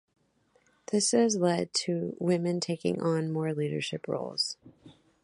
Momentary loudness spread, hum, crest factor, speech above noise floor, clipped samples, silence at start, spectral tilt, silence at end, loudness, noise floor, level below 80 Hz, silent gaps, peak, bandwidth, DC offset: 9 LU; none; 18 dB; 40 dB; under 0.1%; 0.9 s; -4.5 dB/octave; 0.35 s; -29 LUFS; -69 dBFS; -72 dBFS; none; -12 dBFS; 11.5 kHz; under 0.1%